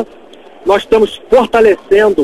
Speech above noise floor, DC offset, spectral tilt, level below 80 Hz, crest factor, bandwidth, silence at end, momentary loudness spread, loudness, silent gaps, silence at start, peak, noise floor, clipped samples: 28 dB; 0.5%; -5 dB/octave; -38 dBFS; 12 dB; 12.5 kHz; 0 s; 8 LU; -11 LUFS; none; 0 s; 0 dBFS; -37 dBFS; 0.2%